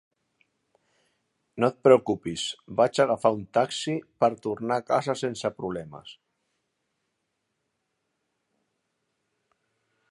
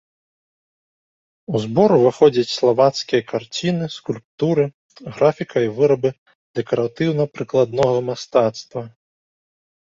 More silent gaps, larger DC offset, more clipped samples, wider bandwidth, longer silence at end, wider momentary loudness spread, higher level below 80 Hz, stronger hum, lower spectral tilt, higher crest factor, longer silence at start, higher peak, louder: second, none vs 4.25-4.38 s, 4.74-4.89 s, 6.18-6.26 s, 6.35-6.54 s; neither; neither; first, 11.5 kHz vs 7.8 kHz; first, 4 s vs 1.05 s; about the same, 14 LU vs 14 LU; second, -66 dBFS vs -60 dBFS; neither; second, -5 dB/octave vs -6.5 dB/octave; first, 24 dB vs 18 dB; about the same, 1.55 s vs 1.5 s; about the same, -4 dBFS vs -2 dBFS; second, -25 LUFS vs -19 LUFS